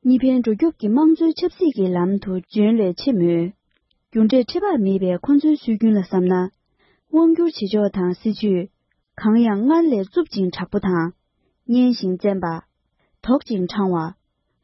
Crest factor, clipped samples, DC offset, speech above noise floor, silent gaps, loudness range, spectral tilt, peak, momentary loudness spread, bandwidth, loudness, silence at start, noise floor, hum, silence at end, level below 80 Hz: 14 dB; under 0.1%; under 0.1%; 50 dB; none; 3 LU; -9 dB/octave; -6 dBFS; 8 LU; 6 kHz; -19 LUFS; 0.05 s; -68 dBFS; none; 0.5 s; -54 dBFS